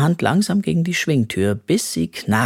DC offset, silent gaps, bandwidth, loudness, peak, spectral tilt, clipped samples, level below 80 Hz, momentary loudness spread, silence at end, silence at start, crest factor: under 0.1%; none; 16.5 kHz; -19 LUFS; 0 dBFS; -5.5 dB/octave; under 0.1%; -52 dBFS; 4 LU; 0 s; 0 s; 18 dB